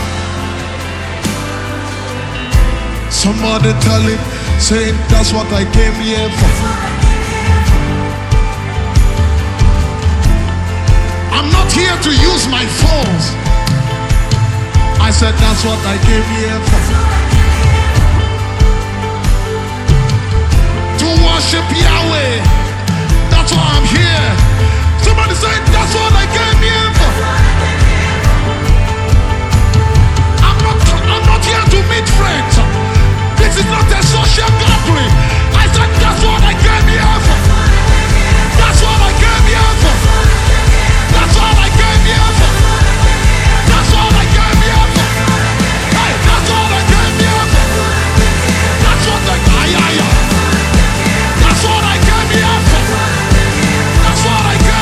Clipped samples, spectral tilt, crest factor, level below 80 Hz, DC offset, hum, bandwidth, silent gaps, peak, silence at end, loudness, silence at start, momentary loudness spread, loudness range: 0.4%; -4.5 dB/octave; 10 dB; -14 dBFS; under 0.1%; none; 14.5 kHz; none; 0 dBFS; 0 s; -11 LUFS; 0 s; 5 LU; 3 LU